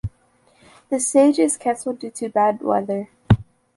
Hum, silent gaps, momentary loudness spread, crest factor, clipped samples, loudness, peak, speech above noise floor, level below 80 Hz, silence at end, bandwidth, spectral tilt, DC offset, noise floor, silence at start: none; none; 13 LU; 18 dB; under 0.1%; -20 LUFS; -2 dBFS; 39 dB; -42 dBFS; 0.35 s; 11.5 kHz; -6 dB/octave; under 0.1%; -58 dBFS; 0.05 s